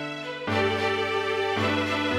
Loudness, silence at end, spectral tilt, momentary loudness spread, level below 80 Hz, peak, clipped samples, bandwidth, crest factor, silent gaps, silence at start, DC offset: -26 LUFS; 0 s; -5 dB/octave; 5 LU; -62 dBFS; -12 dBFS; under 0.1%; 15.5 kHz; 14 dB; none; 0 s; under 0.1%